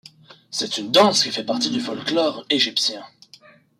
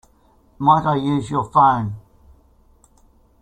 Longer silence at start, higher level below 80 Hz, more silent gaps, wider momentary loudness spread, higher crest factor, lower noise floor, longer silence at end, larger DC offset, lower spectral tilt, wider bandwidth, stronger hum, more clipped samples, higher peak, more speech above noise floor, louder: about the same, 0.5 s vs 0.6 s; second, -70 dBFS vs -50 dBFS; neither; about the same, 10 LU vs 11 LU; about the same, 18 dB vs 20 dB; second, -50 dBFS vs -55 dBFS; second, 0.75 s vs 1.45 s; neither; second, -2.5 dB/octave vs -7.5 dB/octave; first, 16 kHz vs 10.5 kHz; neither; neither; about the same, -4 dBFS vs -2 dBFS; second, 30 dB vs 38 dB; about the same, -20 LUFS vs -18 LUFS